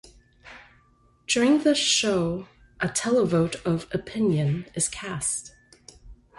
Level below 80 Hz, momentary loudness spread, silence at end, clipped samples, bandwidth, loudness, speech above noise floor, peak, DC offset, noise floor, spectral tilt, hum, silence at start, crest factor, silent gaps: -54 dBFS; 11 LU; 0.25 s; under 0.1%; 12 kHz; -24 LUFS; 37 dB; -10 dBFS; under 0.1%; -61 dBFS; -4 dB/octave; none; 0.45 s; 16 dB; none